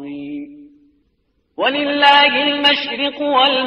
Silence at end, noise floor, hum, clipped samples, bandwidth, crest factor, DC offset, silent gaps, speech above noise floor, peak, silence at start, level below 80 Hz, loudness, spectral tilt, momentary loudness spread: 0 s; -64 dBFS; none; under 0.1%; 9.8 kHz; 16 dB; under 0.1%; none; 50 dB; 0 dBFS; 0 s; -64 dBFS; -14 LUFS; -3.5 dB/octave; 19 LU